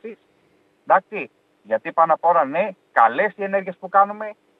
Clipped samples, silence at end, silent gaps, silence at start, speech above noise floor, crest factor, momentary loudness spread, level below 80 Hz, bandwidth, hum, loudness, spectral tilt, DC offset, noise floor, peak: under 0.1%; 0.25 s; none; 0.05 s; 41 dB; 20 dB; 14 LU; -84 dBFS; 4.3 kHz; none; -20 LUFS; -7.5 dB/octave; under 0.1%; -61 dBFS; -2 dBFS